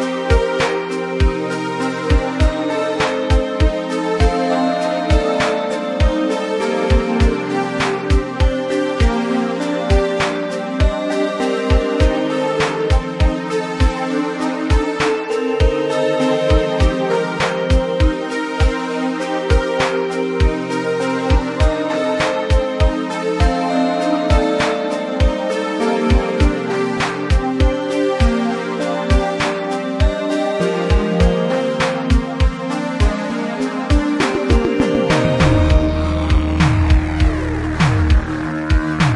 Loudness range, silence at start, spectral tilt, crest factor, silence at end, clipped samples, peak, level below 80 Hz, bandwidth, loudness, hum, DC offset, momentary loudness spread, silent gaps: 2 LU; 0 s; -6.5 dB/octave; 16 dB; 0 s; under 0.1%; -2 dBFS; -22 dBFS; 11.5 kHz; -17 LUFS; none; under 0.1%; 5 LU; none